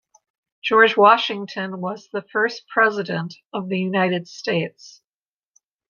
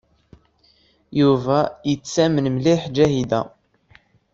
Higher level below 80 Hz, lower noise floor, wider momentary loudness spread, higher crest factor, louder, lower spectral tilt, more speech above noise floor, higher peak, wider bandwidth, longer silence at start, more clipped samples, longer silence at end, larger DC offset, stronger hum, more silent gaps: second, -72 dBFS vs -52 dBFS; first, under -90 dBFS vs -59 dBFS; first, 15 LU vs 7 LU; about the same, 20 dB vs 18 dB; about the same, -20 LUFS vs -19 LUFS; about the same, -5.5 dB/octave vs -6.5 dB/octave; first, over 70 dB vs 40 dB; about the same, -2 dBFS vs -2 dBFS; second, 7.2 kHz vs 8 kHz; second, 0.65 s vs 1.1 s; neither; first, 1 s vs 0.85 s; neither; neither; first, 3.46-3.50 s vs none